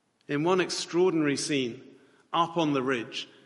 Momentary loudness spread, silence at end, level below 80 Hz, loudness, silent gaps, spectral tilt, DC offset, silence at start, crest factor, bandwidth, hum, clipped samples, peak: 9 LU; 0.2 s; -74 dBFS; -28 LUFS; none; -4.5 dB/octave; under 0.1%; 0.3 s; 18 dB; 11.5 kHz; none; under 0.1%; -10 dBFS